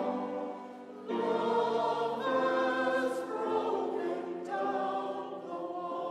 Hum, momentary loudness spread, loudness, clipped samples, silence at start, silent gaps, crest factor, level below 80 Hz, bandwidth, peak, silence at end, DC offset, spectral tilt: none; 10 LU; -33 LUFS; under 0.1%; 0 s; none; 16 dB; -84 dBFS; 13 kHz; -18 dBFS; 0 s; under 0.1%; -5.5 dB/octave